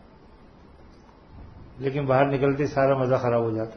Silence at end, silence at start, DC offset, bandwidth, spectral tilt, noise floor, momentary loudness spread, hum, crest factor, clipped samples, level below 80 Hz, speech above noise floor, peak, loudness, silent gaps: 0 s; 1.3 s; under 0.1%; 6.6 kHz; -8.5 dB/octave; -50 dBFS; 7 LU; none; 18 dB; under 0.1%; -52 dBFS; 28 dB; -8 dBFS; -23 LUFS; none